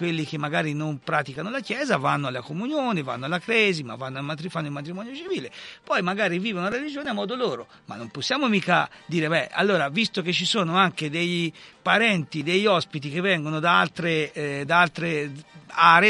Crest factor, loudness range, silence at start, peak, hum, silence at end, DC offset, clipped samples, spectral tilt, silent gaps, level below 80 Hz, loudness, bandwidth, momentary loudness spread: 22 dB; 5 LU; 0 s; -2 dBFS; none; 0 s; under 0.1%; under 0.1%; -5 dB/octave; none; -68 dBFS; -24 LUFS; 11.5 kHz; 11 LU